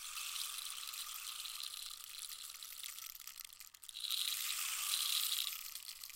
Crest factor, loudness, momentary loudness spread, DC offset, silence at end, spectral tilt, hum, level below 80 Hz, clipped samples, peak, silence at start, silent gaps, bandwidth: 26 dB; -40 LUFS; 14 LU; under 0.1%; 0 s; 5 dB/octave; none; -78 dBFS; under 0.1%; -18 dBFS; 0 s; none; 17 kHz